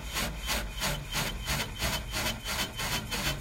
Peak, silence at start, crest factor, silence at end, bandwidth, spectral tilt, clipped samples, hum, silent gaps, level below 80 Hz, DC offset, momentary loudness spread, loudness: -16 dBFS; 0 s; 18 dB; 0 s; 16.5 kHz; -2.5 dB/octave; under 0.1%; none; none; -40 dBFS; under 0.1%; 2 LU; -32 LUFS